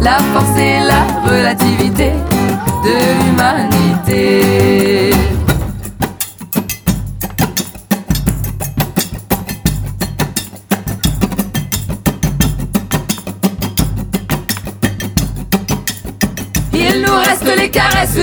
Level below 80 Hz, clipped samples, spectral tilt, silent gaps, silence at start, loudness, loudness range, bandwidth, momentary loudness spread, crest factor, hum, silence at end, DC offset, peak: -26 dBFS; under 0.1%; -5 dB/octave; none; 0 s; -14 LUFS; 6 LU; over 20 kHz; 9 LU; 14 dB; none; 0 s; under 0.1%; 0 dBFS